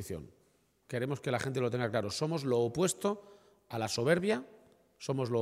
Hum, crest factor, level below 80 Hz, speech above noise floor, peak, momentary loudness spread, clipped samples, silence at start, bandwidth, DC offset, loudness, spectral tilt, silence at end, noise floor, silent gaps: none; 20 dB; -68 dBFS; 38 dB; -14 dBFS; 13 LU; under 0.1%; 0 s; 16 kHz; under 0.1%; -33 LUFS; -5 dB/octave; 0 s; -71 dBFS; none